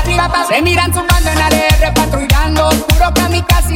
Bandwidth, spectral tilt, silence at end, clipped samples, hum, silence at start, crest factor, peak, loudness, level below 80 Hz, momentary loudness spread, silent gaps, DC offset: 17 kHz; -4.5 dB/octave; 0 s; under 0.1%; none; 0 s; 10 dB; 0 dBFS; -11 LUFS; -16 dBFS; 2 LU; none; under 0.1%